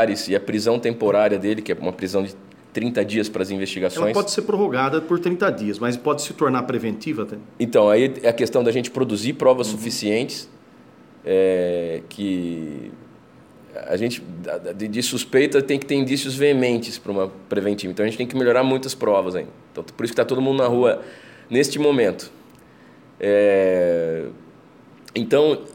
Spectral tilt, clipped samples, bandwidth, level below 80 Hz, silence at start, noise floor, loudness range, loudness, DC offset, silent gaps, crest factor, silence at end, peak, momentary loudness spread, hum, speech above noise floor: -5 dB/octave; under 0.1%; 17 kHz; -64 dBFS; 0 s; -48 dBFS; 4 LU; -21 LUFS; under 0.1%; none; 18 dB; 0.05 s; -4 dBFS; 12 LU; none; 27 dB